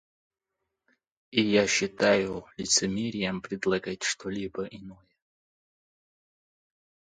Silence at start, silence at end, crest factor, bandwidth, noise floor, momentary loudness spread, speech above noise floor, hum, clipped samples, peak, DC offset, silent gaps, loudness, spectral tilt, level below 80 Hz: 1.3 s; 2.15 s; 24 dB; 9.6 kHz; -77 dBFS; 12 LU; 49 dB; none; under 0.1%; -8 dBFS; under 0.1%; none; -27 LUFS; -3 dB/octave; -62 dBFS